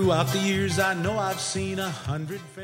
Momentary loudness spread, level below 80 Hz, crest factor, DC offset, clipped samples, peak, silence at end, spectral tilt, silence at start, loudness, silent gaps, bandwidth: 8 LU; -52 dBFS; 18 dB; under 0.1%; under 0.1%; -8 dBFS; 0 s; -4.5 dB/octave; 0 s; -26 LUFS; none; 16 kHz